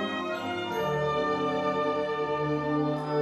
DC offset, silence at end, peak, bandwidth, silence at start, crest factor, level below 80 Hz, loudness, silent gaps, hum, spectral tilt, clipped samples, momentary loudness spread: under 0.1%; 0 s; -16 dBFS; 13 kHz; 0 s; 12 dB; -58 dBFS; -29 LUFS; none; none; -6.5 dB/octave; under 0.1%; 4 LU